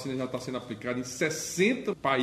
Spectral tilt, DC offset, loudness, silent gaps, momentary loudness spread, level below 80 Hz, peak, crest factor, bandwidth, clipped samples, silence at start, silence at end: -4 dB/octave; under 0.1%; -30 LUFS; none; 9 LU; -64 dBFS; -10 dBFS; 20 dB; 15 kHz; under 0.1%; 0 s; 0 s